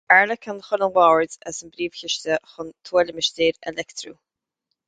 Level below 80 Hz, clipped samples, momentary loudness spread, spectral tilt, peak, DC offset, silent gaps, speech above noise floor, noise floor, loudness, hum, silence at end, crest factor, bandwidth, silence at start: -62 dBFS; under 0.1%; 17 LU; -2.5 dB/octave; 0 dBFS; under 0.1%; none; 57 dB; -79 dBFS; -21 LUFS; none; 0.75 s; 22 dB; 9.4 kHz; 0.1 s